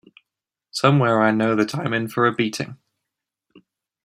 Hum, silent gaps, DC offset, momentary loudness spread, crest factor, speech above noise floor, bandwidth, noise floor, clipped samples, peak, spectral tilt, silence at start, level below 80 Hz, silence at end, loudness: none; none; under 0.1%; 12 LU; 20 dB; 66 dB; 15.5 kHz; -86 dBFS; under 0.1%; -2 dBFS; -6 dB/octave; 0.75 s; -64 dBFS; 1.3 s; -20 LUFS